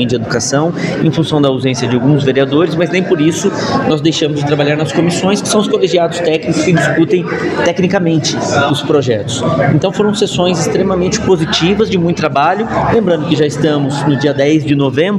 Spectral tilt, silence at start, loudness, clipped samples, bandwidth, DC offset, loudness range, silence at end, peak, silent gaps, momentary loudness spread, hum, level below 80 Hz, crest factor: -5.5 dB/octave; 0 s; -12 LUFS; under 0.1%; 12.5 kHz; under 0.1%; 0 LU; 0 s; 0 dBFS; none; 3 LU; none; -42 dBFS; 12 dB